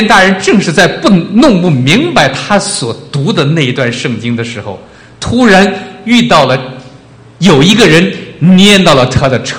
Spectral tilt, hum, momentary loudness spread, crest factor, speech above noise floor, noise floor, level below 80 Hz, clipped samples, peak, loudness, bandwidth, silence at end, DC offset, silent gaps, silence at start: -5 dB/octave; none; 11 LU; 8 dB; 28 dB; -35 dBFS; -36 dBFS; 3%; 0 dBFS; -7 LUFS; 14.5 kHz; 0 s; under 0.1%; none; 0 s